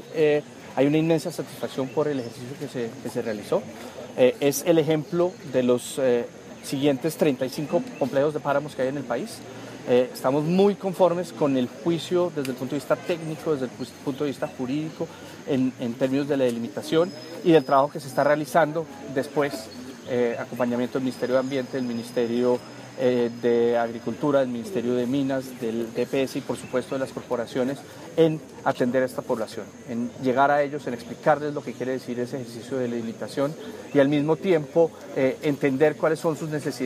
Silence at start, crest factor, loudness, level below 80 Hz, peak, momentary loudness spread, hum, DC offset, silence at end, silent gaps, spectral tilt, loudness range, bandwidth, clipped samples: 0 s; 20 dB; -25 LUFS; -68 dBFS; -4 dBFS; 11 LU; none; under 0.1%; 0 s; none; -6 dB/octave; 4 LU; 15.5 kHz; under 0.1%